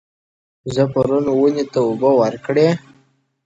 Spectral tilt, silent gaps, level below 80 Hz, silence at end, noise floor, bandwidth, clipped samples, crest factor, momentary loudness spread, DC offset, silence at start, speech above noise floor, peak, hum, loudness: -7.5 dB/octave; none; -54 dBFS; 0.65 s; -58 dBFS; 8 kHz; under 0.1%; 16 dB; 7 LU; under 0.1%; 0.65 s; 42 dB; -2 dBFS; none; -17 LUFS